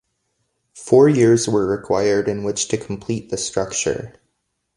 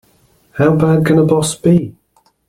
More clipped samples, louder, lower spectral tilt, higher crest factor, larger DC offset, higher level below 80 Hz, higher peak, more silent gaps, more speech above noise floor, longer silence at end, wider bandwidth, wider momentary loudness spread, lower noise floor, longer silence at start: neither; second, -19 LUFS vs -13 LUFS; second, -5 dB/octave vs -6.5 dB/octave; first, 18 dB vs 12 dB; neither; about the same, -50 dBFS vs -46 dBFS; about the same, 0 dBFS vs -2 dBFS; neither; first, 55 dB vs 42 dB; about the same, 0.65 s vs 0.6 s; second, 11.5 kHz vs 14 kHz; first, 13 LU vs 10 LU; first, -73 dBFS vs -53 dBFS; first, 0.75 s vs 0.55 s